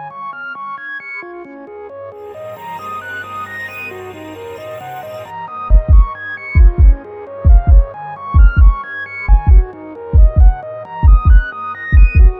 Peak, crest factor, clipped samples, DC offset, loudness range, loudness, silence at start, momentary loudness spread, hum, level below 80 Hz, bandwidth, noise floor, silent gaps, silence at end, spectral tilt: 0 dBFS; 12 dB; under 0.1%; under 0.1%; 14 LU; -14 LUFS; 0 s; 19 LU; none; -12 dBFS; 3.7 kHz; -32 dBFS; none; 0 s; -8.5 dB/octave